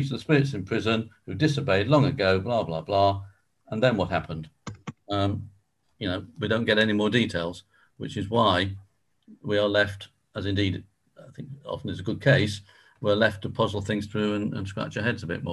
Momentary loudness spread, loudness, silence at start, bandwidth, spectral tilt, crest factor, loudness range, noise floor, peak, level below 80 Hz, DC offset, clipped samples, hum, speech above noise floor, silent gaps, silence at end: 16 LU; -26 LUFS; 0 s; 12 kHz; -6.5 dB/octave; 20 dB; 4 LU; -62 dBFS; -6 dBFS; -48 dBFS; under 0.1%; under 0.1%; none; 37 dB; none; 0 s